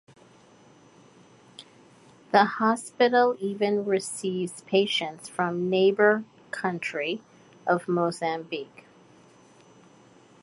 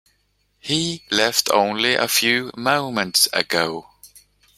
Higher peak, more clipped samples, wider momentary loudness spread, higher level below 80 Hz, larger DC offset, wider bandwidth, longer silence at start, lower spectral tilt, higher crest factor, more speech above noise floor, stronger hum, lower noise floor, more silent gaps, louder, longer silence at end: second, -6 dBFS vs 0 dBFS; neither; first, 12 LU vs 6 LU; second, -76 dBFS vs -60 dBFS; neither; second, 11.5 kHz vs 16.5 kHz; first, 1.6 s vs 0.65 s; first, -4.5 dB/octave vs -2 dB/octave; about the same, 22 dB vs 22 dB; second, 30 dB vs 46 dB; second, none vs 50 Hz at -60 dBFS; second, -55 dBFS vs -66 dBFS; neither; second, -26 LUFS vs -19 LUFS; first, 1.75 s vs 0.5 s